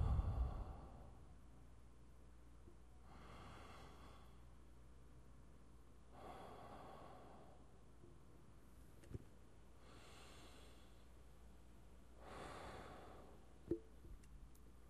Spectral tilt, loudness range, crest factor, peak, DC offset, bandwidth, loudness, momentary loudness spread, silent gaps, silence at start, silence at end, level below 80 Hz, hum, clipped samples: -7 dB/octave; 7 LU; 24 dB; -28 dBFS; under 0.1%; 13 kHz; -57 LUFS; 17 LU; none; 0 s; 0 s; -56 dBFS; none; under 0.1%